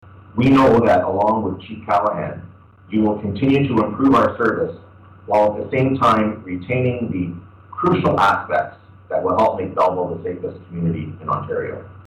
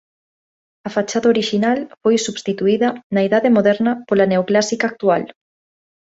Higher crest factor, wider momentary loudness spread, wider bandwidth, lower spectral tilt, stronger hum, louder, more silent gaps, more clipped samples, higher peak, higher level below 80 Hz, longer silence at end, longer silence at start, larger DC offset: second, 10 dB vs 16 dB; first, 13 LU vs 7 LU; first, 10 kHz vs 8 kHz; first, -8 dB/octave vs -5 dB/octave; neither; about the same, -19 LUFS vs -17 LUFS; second, none vs 3.03-3.10 s; neither; second, -8 dBFS vs -2 dBFS; first, -48 dBFS vs -62 dBFS; second, 0.05 s vs 0.85 s; second, 0.15 s vs 0.85 s; neither